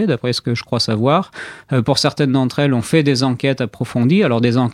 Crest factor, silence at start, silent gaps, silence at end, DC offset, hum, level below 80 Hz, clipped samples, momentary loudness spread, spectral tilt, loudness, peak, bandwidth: 16 dB; 0 s; none; 0 s; under 0.1%; none; -54 dBFS; under 0.1%; 6 LU; -6 dB/octave; -16 LUFS; 0 dBFS; 14 kHz